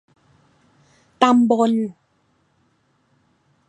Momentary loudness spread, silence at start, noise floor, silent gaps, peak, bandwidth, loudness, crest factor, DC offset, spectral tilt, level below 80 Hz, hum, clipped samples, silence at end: 9 LU; 1.2 s; -64 dBFS; none; -2 dBFS; 9 kHz; -18 LUFS; 22 dB; under 0.1%; -5.5 dB/octave; -72 dBFS; none; under 0.1%; 1.75 s